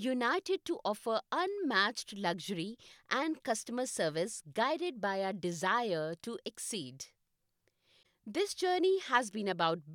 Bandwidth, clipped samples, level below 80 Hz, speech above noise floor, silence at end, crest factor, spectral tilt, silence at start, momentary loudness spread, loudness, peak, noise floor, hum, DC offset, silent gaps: 17 kHz; under 0.1%; -80 dBFS; 46 dB; 0 s; 22 dB; -3.5 dB/octave; 0 s; 10 LU; -34 LUFS; -14 dBFS; -81 dBFS; none; under 0.1%; none